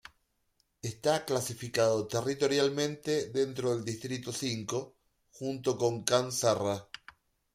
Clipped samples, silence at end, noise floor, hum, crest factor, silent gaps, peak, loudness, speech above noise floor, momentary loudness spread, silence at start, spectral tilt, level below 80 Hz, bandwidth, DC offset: under 0.1%; 0.7 s; -75 dBFS; none; 26 dB; none; -6 dBFS; -31 LUFS; 45 dB; 11 LU; 0.85 s; -4 dB/octave; -68 dBFS; 16 kHz; under 0.1%